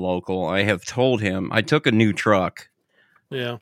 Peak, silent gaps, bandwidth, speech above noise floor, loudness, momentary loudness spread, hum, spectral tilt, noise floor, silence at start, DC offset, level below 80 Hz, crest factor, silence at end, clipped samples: -2 dBFS; none; 14 kHz; 40 dB; -21 LUFS; 10 LU; none; -5.5 dB/octave; -61 dBFS; 0 s; under 0.1%; -58 dBFS; 20 dB; 0.05 s; under 0.1%